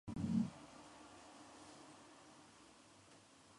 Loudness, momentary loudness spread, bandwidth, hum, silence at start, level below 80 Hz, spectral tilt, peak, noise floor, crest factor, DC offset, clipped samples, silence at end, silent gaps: -46 LUFS; 23 LU; 11.5 kHz; none; 0.05 s; -70 dBFS; -6.5 dB/octave; -26 dBFS; -65 dBFS; 22 dB; under 0.1%; under 0.1%; 0.4 s; none